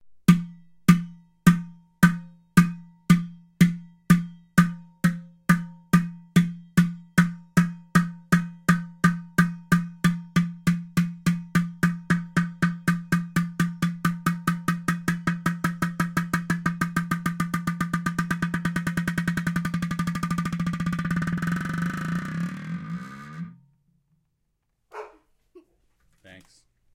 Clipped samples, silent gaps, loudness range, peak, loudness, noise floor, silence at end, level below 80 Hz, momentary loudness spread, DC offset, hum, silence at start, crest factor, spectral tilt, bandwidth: under 0.1%; none; 7 LU; -2 dBFS; -25 LUFS; -74 dBFS; 0.55 s; -52 dBFS; 10 LU; under 0.1%; none; 0.05 s; 22 dB; -6 dB/octave; 16.5 kHz